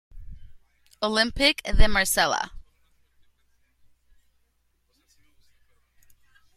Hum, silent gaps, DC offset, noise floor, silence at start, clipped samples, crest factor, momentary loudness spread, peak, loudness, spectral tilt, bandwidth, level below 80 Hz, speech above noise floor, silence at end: none; none; under 0.1%; -69 dBFS; 0.15 s; under 0.1%; 24 dB; 9 LU; -4 dBFS; -23 LUFS; -2.5 dB/octave; 14.5 kHz; -32 dBFS; 50 dB; 3.95 s